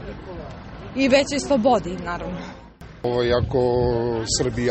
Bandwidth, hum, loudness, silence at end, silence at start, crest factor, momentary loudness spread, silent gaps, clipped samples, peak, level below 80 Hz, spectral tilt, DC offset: 8.8 kHz; none; -21 LUFS; 0 s; 0 s; 18 dB; 18 LU; none; under 0.1%; -4 dBFS; -40 dBFS; -5 dB/octave; under 0.1%